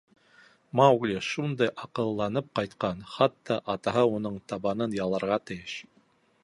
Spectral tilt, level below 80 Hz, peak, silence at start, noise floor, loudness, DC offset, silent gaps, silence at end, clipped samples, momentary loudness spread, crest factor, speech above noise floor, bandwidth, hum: -6 dB/octave; -62 dBFS; -6 dBFS; 0.75 s; -65 dBFS; -28 LUFS; under 0.1%; none; 0.6 s; under 0.1%; 11 LU; 22 dB; 38 dB; 11.5 kHz; none